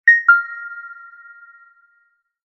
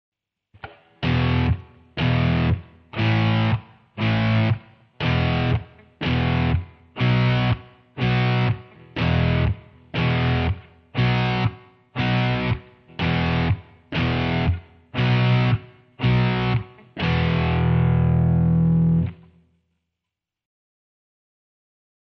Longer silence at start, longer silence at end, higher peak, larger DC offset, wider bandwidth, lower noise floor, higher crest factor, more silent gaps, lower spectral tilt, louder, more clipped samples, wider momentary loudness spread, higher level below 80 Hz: second, 0.05 s vs 0.65 s; second, 1.55 s vs 2.9 s; first, -2 dBFS vs -8 dBFS; neither; about the same, 6 kHz vs 6 kHz; second, -63 dBFS vs -85 dBFS; about the same, 18 dB vs 14 dB; neither; second, 2 dB/octave vs -8.5 dB/octave; first, -14 LUFS vs -22 LUFS; neither; first, 26 LU vs 12 LU; second, -70 dBFS vs -36 dBFS